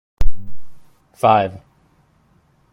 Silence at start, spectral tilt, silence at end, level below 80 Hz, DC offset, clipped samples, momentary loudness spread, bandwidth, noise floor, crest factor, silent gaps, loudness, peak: 0.2 s; -6.5 dB/octave; 1.15 s; -28 dBFS; under 0.1%; under 0.1%; 15 LU; 10.5 kHz; -57 dBFS; 16 dB; none; -19 LUFS; 0 dBFS